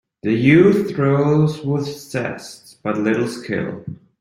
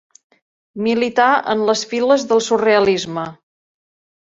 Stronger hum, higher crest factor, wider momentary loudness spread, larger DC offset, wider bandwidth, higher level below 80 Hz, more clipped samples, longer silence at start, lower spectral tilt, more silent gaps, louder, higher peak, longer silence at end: neither; about the same, 18 dB vs 16 dB; first, 17 LU vs 12 LU; neither; first, 13 kHz vs 8 kHz; first, -54 dBFS vs -60 dBFS; neither; second, 0.25 s vs 0.75 s; first, -7.5 dB/octave vs -4 dB/octave; neither; about the same, -18 LUFS vs -16 LUFS; about the same, 0 dBFS vs -2 dBFS; second, 0.25 s vs 0.9 s